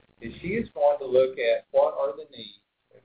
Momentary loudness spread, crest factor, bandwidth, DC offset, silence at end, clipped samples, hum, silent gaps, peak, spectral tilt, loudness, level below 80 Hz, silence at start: 18 LU; 18 dB; 4 kHz; under 0.1%; 0.55 s; under 0.1%; none; none; -10 dBFS; -9 dB/octave; -25 LUFS; -58 dBFS; 0.2 s